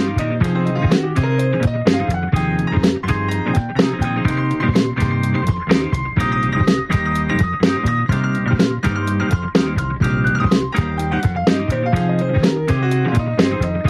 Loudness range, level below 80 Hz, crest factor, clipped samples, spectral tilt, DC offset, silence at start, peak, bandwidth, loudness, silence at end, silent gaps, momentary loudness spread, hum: 1 LU; -34 dBFS; 14 dB; under 0.1%; -7 dB/octave; under 0.1%; 0 s; -2 dBFS; 13 kHz; -18 LUFS; 0 s; none; 3 LU; none